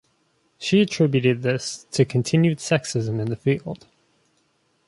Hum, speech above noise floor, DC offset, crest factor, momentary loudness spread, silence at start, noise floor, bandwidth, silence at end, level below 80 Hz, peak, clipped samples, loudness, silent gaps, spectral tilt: none; 45 dB; under 0.1%; 18 dB; 8 LU; 0.6 s; -66 dBFS; 11.5 kHz; 1.1 s; -58 dBFS; -4 dBFS; under 0.1%; -22 LUFS; none; -6 dB/octave